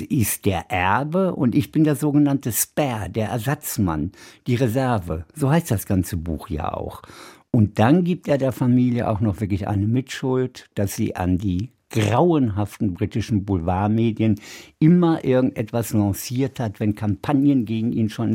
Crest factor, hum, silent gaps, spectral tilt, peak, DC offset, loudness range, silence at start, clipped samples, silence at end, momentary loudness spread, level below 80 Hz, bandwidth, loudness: 18 dB; none; none; -6.5 dB/octave; -2 dBFS; under 0.1%; 3 LU; 0 s; under 0.1%; 0 s; 9 LU; -46 dBFS; 16.5 kHz; -21 LUFS